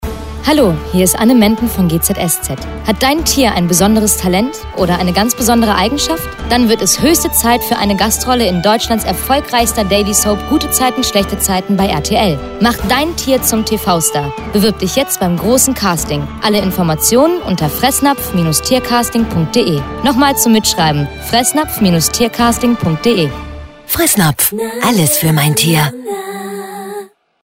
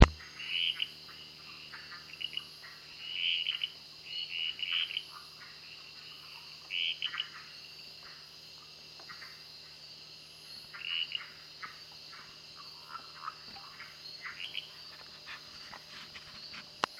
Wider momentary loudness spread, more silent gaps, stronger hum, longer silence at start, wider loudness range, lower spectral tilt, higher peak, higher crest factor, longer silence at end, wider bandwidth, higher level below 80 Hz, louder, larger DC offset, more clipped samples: second, 7 LU vs 16 LU; neither; neither; about the same, 0 s vs 0 s; second, 1 LU vs 9 LU; about the same, -4 dB/octave vs -4 dB/octave; about the same, 0 dBFS vs -2 dBFS; second, 12 dB vs 36 dB; first, 0.35 s vs 0 s; about the same, 16.5 kHz vs 16.5 kHz; first, -30 dBFS vs -46 dBFS; first, -12 LUFS vs -38 LUFS; neither; neither